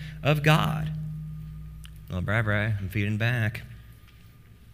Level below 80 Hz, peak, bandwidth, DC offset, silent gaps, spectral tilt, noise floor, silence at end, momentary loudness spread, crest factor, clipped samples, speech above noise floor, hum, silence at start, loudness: -46 dBFS; -6 dBFS; 16 kHz; under 0.1%; none; -6.5 dB/octave; -51 dBFS; 0 s; 21 LU; 22 dB; under 0.1%; 26 dB; none; 0 s; -26 LUFS